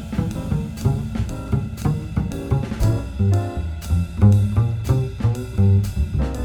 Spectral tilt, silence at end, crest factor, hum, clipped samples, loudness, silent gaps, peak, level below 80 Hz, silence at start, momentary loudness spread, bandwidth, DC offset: -8 dB/octave; 0 s; 16 dB; none; under 0.1%; -21 LUFS; none; -4 dBFS; -30 dBFS; 0 s; 8 LU; 14.5 kHz; under 0.1%